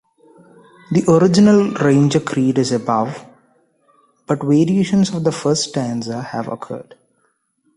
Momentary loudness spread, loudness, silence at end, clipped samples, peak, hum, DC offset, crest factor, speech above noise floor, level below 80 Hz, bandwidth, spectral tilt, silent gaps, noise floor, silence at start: 13 LU; -16 LUFS; 0.95 s; under 0.1%; -2 dBFS; none; under 0.1%; 16 dB; 49 dB; -56 dBFS; 11 kHz; -6 dB/octave; none; -65 dBFS; 0.9 s